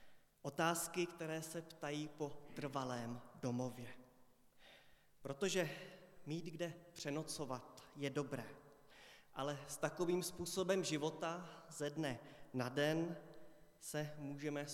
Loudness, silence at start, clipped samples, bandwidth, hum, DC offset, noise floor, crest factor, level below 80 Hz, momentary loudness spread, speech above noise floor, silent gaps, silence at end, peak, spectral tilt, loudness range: -44 LUFS; 0 s; under 0.1%; 17.5 kHz; none; under 0.1%; -69 dBFS; 22 dB; -76 dBFS; 18 LU; 26 dB; none; 0 s; -24 dBFS; -4.5 dB/octave; 5 LU